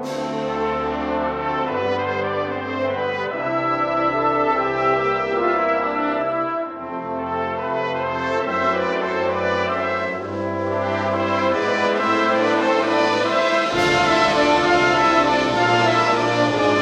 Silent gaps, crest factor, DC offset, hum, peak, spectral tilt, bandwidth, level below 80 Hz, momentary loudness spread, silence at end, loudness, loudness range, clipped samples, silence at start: none; 16 dB; under 0.1%; none; -4 dBFS; -5 dB/octave; 12 kHz; -50 dBFS; 8 LU; 0 s; -20 LUFS; 6 LU; under 0.1%; 0 s